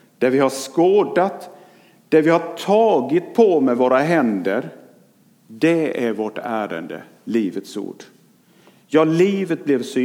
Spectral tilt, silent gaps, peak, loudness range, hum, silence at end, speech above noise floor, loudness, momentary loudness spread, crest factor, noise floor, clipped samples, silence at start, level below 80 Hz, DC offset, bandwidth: -6 dB/octave; none; -2 dBFS; 6 LU; none; 0 s; 36 dB; -18 LUFS; 14 LU; 18 dB; -54 dBFS; under 0.1%; 0.2 s; -74 dBFS; under 0.1%; 16.5 kHz